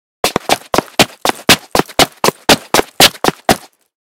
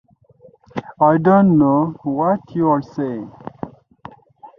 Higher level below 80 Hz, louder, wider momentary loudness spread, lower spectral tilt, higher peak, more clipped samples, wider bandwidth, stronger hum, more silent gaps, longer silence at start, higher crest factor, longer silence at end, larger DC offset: first, -40 dBFS vs -58 dBFS; first, -12 LUFS vs -16 LUFS; second, 8 LU vs 20 LU; second, -2 dB/octave vs -10.5 dB/octave; about the same, 0 dBFS vs -2 dBFS; first, 1% vs under 0.1%; first, over 20 kHz vs 6 kHz; neither; neither; second, 0.25 s vs 0.75 s; about the same, 14 dB vs 16 dB; first, 0.5 s vs 0.1 s; neither